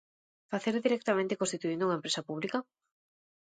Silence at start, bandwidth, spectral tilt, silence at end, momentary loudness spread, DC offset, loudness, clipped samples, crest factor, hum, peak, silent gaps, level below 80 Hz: 0.5 s; 9.6 kHz; -4 dB/octave; 0.9 s; 6 LU; under 0.1%; -32 LUFS; under 0.1%; 18 dB; none; -14 dBFS; none; -80 dBFS